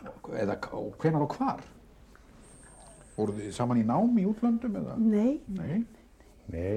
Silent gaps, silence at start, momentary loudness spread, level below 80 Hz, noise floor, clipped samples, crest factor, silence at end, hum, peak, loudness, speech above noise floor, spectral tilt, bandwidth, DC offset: none; 0 s; 12 LU; -56 dBFS; -56 dBFS; under 0.1%; 16 dB; 0 s; none; -14 dBFS; -30 LUFS; 27 dB; -8 dB/octave; 10 kHz; under 0.1%